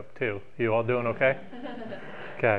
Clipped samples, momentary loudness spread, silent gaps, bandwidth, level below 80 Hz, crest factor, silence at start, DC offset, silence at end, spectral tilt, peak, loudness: under 0.1%; 15 LU; none; 5.2 kHz; -66 dBFS; 20 dB; 0 s; 0.9%; 0 s; -8.5 dB/octave; -8 dBFS; -28 LUFS